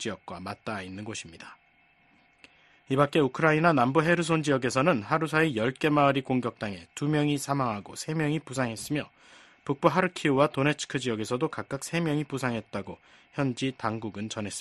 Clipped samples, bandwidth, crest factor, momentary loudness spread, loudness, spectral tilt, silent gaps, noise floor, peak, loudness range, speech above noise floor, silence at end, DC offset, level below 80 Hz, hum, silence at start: under 0.1%; 12.5 kHz; 22 dB; 14 LU; -28 LUFS; -5.5 dB/octave; none; -63 dBFS; -6 dBFS; 7 LU; 36 dB; 0 s; under 0.1%; -62 dBFS; none; 0 s